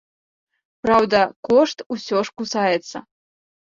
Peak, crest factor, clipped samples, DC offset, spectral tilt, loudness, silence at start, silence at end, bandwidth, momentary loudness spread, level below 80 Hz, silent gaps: -2 dBFS; 20 dB; under 0.1%; under 0.1%; -4.5 dB/octave; -20 LUFS; 0.85 s; 0.75 s; 7.6 kHz; 12 LU; -58 dBFS; 1.36-1.43 s, 1.86-1.90 s